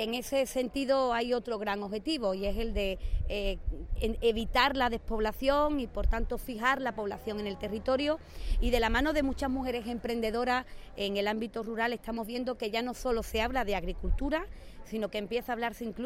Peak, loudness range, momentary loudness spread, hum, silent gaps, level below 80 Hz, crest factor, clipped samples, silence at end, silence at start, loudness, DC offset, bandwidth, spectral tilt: -12 dBFS; 3 LU; 8 LU; none; none; -38 dBFS; 20 dB; under 0.1%; 0 s; 0 s; -32 LUFS; under 0.1%; 16.5 kHz; -5 dB/octave